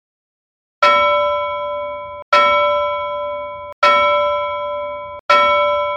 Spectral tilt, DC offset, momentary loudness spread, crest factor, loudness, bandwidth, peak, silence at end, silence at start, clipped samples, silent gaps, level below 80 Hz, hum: -2.5 dB/octave; under 0.1%; 15 LU; 16 dB; -15 LUFS; 8.8 kHz; 0 dBFS; 0 s; 0.8 s; under 0.1%; 2.22-2.32 s, 3.73-3.82 s, 5.20-5.29 s; -52 dBFS; none